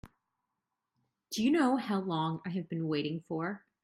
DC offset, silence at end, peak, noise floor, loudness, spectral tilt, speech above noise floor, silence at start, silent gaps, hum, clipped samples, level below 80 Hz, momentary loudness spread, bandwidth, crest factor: under 0.1%; 0.25 s; -16 dBFS; -87 dBFS; -33 LUFS; -6 dB/octave; 55 dB; 0.05 s; none; none; under 0.1%; -72 dBFS; 9 LU; 15.5 kHz; 18 dB